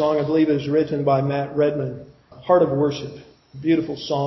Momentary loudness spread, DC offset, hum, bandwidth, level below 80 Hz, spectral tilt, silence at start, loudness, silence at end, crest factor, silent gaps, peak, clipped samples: 13 LU; under 0.1%; none; 6 kHz; -56 dBFS; -8 dB/octave; 0 s; -21 LUFS; 0 s; 18 dB; none; -4 dBFS; under 0.1%